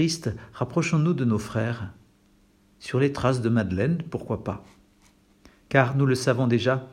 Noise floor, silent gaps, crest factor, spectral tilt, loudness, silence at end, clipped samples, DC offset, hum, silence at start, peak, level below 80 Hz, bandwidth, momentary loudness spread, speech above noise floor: -60 dBFS; none; 22 dB; -6.5 dB/octave; -25 LUFS; 0 s; under 0.1%; under 0.1%; none; 0 s; -4 dBFS; -56 dBFS; 12.5 kHz; 11 LU; 36 dB